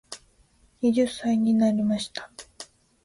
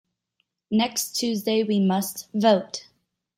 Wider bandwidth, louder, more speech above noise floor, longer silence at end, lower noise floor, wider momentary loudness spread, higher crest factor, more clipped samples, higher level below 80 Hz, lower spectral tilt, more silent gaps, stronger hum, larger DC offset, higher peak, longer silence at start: second, 11.5 kHz vs 16.5 kHz; about the same, -24 LUFS vs -23 LUFS; second, 38 dB vs 52 dB; second, 0.4 s vs 0.55 s; second, -61 dBFS vs -75 dBFS; first, 22 LU vs 8 LU; about the same, 14 dB vs 18 dB; neither; first, -62 dBFS vs -70 dBFS; about the same, -5.5 dB/octave vs -4.5 dB/octave; neither; neither; neither; second, -12 dBFS vs -6 dBFS; second, 0.1 s vs 0.7 s